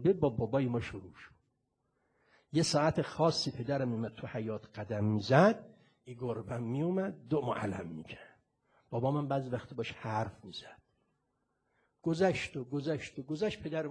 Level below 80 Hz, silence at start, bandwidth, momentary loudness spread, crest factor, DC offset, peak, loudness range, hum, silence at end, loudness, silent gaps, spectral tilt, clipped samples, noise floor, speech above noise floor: -64 dBFS; 0 s; 10.5 kHz; 14 LU; 24 dB; under 0.1%; -10 dBFS; 6 LU; none; 0 s; -34 LUFS; none; -6 dB/octave; under 0.1%; -80 dBFS; 47 dB